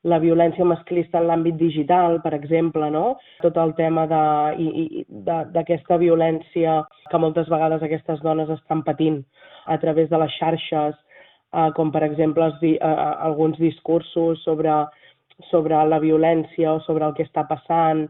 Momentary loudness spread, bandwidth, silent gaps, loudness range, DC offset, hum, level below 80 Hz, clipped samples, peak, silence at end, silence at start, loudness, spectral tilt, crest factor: 7 LU; 4 kHz; none; 2 LU; under 0.1%; none; -60 dBFS; under 0.1%; -4 dBFS; 0 s; 0.05 s; -21 LUFS; -6.5 dB/octave; 16 dB